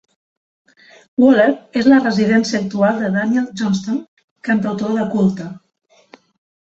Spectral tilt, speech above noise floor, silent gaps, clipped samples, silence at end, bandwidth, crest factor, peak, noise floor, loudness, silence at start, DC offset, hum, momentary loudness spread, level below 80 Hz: -6.5 dB/octave; 33 dB; 4.08-4.17 s, 4.24-4.36 s; under 0.1%; 1.1 s; 7.8 kHz; 16 dB; -2 dBFS; -48 dBFS; -16 LUFS; 1.2 s; under 0.1%; none; 12 LU; -58 dBFS